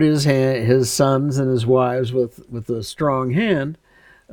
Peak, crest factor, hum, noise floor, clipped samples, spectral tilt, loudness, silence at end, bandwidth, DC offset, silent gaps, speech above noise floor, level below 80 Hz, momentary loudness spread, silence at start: -2 dBFS; 16 dB; none; -51 dBFS; under 0.1%; -6 dB/octave; -19 LUFS; 0 s; 19 kHz; under 0.1%; none; 33 dB; -52 dBFS; 10 LU; 0 s